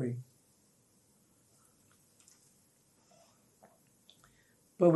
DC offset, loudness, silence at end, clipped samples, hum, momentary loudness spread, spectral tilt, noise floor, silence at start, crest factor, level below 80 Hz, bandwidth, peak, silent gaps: under 0.1%; -34 LUFS; 0 s; under 0.1%; none; 23 LU; -8.5 dB/octave; -69 dBFS; 0 s; 24 dB; -84 dBFS; 12 kHz; -14 dBFS; none